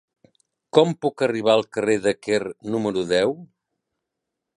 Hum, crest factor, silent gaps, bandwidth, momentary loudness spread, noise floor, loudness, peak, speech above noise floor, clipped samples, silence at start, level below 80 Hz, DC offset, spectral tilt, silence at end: none; 22 dB; none; 11.5 kHz; 6 LU; -82 dBFS; -22 LUFS; -2 dBFS; 61 dB; under 0.1%; 0.75 s; -62 dBFS; under 0.1%; -5 dB/octave; 1.15 s